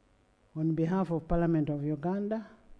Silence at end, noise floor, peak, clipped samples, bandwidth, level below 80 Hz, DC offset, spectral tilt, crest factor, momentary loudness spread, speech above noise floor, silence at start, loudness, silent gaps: 0.25 s; -66 dBFS; -16 dBFS; under 0.1%; 6.4 kHz; -46 dBFS; under 0.1%; -10 dB/octave; 16 dB; 7 LU; 36 dB; 0.55 s; -31 LUFS; none